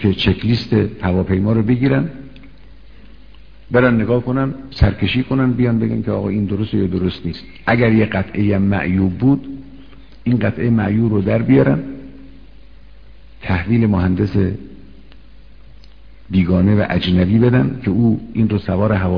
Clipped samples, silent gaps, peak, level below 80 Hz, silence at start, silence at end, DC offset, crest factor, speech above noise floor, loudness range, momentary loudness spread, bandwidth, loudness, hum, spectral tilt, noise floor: under 0.1%; none; 0 dBFS; -34 dBFS; 0 s; 0 s; 1%; 16 dB; 27 dB; 3 LU; 8 LU; 5.4 kHz; -17 LUFS; none; -9.5 dB/octave; -43 dBFS